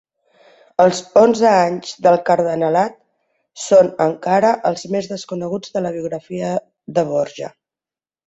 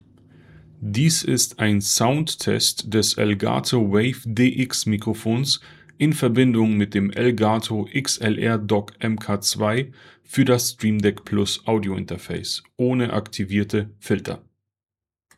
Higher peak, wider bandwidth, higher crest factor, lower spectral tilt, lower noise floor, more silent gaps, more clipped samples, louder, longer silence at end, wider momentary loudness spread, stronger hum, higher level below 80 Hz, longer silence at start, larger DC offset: first, 0 dBFS vs -4 dBFS; second, 8.2 kHz vs 16 kHz; about the same, 16 dB vs 18 dB; about the same, -5.5 dB/octave vs -4.5 dB/octave; about the same, under -90 dBFS vs under -90 dBFS; neither; neither; first, -17 LUFS vs -21 LUFS; second, 0.8 s vs 1 s; first, 12 LU vs 8 LU; neither; about the same, -62 dBFS vs -60 dBFS; about the same, 0.8 s vs 0.8 s; neither